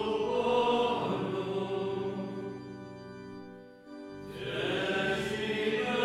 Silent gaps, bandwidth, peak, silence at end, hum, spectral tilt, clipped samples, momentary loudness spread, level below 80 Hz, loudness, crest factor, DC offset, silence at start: none; 13.5 kHz; -16 dBFS; 0 s; none; -5.5 dB/octave; under 0.1%; 18 LU; -64 dBFS; -32 LUFS; 16 dB; under 0.1%; 0 s